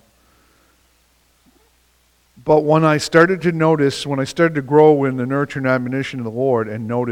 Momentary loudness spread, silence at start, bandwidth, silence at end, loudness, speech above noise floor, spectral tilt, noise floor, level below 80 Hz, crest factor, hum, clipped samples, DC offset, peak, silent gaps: 10 LU; 2.45 s; 13.5 kHz; 0 s; -17 LUFS; 42 dB; -6.5 dB/octave; -58 dBFS; -56 dBFS; 18 dB; none; under 0.1%; under 0.1%; 0 dBFS; none